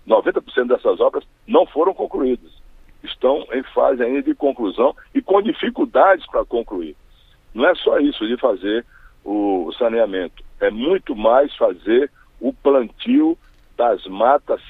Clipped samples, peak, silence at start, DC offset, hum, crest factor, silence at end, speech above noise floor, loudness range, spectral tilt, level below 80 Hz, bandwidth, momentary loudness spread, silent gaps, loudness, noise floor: under 0.1%; 0 dBFS; 0.05 s; under 0.1%; none; 18 dB; 0 s; 29 dB; 2 LU; -7 dB/octave; -48 dBFS; 4.4 kHz; 11 LU; none; -19 LUFS; -47 dBFS